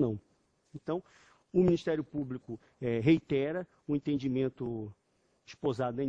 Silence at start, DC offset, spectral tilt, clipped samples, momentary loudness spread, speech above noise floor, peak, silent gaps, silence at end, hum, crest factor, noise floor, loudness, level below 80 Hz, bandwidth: 0 s; under 0.1%; -8.5 dB/octave; under 0.1%; 15 LU; 40 dB; -14 dBFS; none; 0 s; none; 18 dB; -72 dBFS; -33 LUFS; -62 dBFS; 7.8 kHz